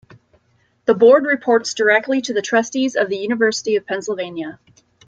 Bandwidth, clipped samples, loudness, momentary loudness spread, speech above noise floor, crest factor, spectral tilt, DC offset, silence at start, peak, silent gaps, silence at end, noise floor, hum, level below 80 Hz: 9 kHz; under 0.1%; -17 LUFS; 13 LU; 44 dB; 16 dB; -3.5 dB/octave; under 0.1%; 0.85 s; -2 dBFS; none; 0.5 s; -61 dBFS; none; -66 dBFS